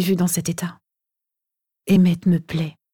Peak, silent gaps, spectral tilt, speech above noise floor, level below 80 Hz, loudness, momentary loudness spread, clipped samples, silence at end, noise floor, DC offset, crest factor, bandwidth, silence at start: -6 dBFS; none; -6 dB/octave; 65 dB; -56 dBFS; -20 LUFS; 13 LU; under 0.1%; 0.25 s; -84 dBFS; under 0.1%; 16 dB; 18.5 kHz; 0 s